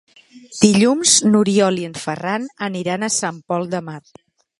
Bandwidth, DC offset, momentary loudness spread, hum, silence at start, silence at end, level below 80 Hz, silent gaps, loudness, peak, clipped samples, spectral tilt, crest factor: 11.5 kHz; under 0.1%; 14 LU; none; 0.35 s; 0.6 s; -58 dBFS; none; -17 LUFS; 0 dBFS; under 0.1%; -3.5 dB/octave; 18 dB